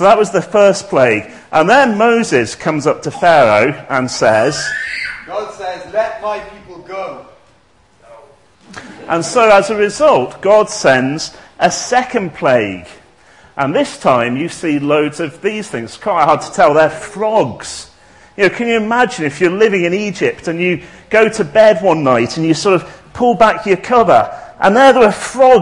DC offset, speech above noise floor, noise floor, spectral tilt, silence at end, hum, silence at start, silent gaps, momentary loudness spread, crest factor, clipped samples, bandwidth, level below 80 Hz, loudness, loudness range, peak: 0.2%; 39 dB; -51 dBFS; -4.5 dB/octave; 0 s; none; 0 s; none; 13 LU; 14 dB; 0.2%; 11 kHz; -50 dBFS; -13 LUFS; 7 LU; 0 dBFS